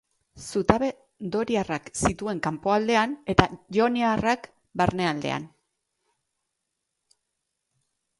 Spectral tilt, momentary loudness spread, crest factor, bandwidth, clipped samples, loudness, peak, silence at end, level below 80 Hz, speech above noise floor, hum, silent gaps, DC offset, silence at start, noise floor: -5 dB/octave; 9 LU; 26 dB; 11.5 kHz; under 0.1%; -25 LUFS; 0 dBFS; 2.75 s; -48 dBFS; 56 dB; none; none; under 0.1%; 0.35 s; -81 dBFS